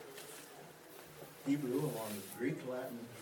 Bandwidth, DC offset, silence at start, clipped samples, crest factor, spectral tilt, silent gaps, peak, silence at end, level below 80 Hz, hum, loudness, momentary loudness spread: 19 kHz; under 0.1%; 0 s; under 0.1%; 18 dB; -5.5 dB/octave; none; -24 dBFS; 0 s; -82 dBFS; none; -41 LUFS; 17 LU